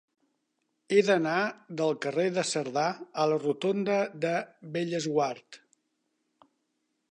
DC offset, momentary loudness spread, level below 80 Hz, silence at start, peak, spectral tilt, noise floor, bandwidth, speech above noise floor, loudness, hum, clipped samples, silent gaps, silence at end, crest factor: under 0.1%; 7 LU; -82 dBFS; 0.9 s; -10 dBFS; -4.5 dB/octave; -79 dBFS; 10.5 kHz; 50 dB; -29 LUFS; none; under 0.1%; none; 1.55 s; 20 dB